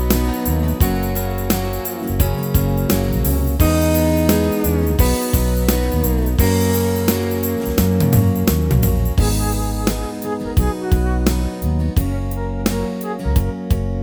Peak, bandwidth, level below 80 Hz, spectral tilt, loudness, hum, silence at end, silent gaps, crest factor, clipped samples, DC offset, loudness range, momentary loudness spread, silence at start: 0 dBFS; over 20 kHz; -22 dBFS; -6 dB/octave; -18 LUFS; none; 0 s; none; 16 dB; under 0.1%; under 0.1%; 3 LU; 6 LU; 0 s